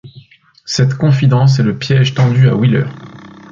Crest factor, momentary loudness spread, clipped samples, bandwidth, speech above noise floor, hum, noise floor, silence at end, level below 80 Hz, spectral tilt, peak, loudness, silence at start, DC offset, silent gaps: 12 dB; 8 LU; under 0.1%; 7.6 kHz; 31 dB; none; -42 dBFS; 0.25 s; -48 dBFS; -6.5 dB/octave; 0 dBFS; -12 LUFS; 0.05 s; under 0.1%; none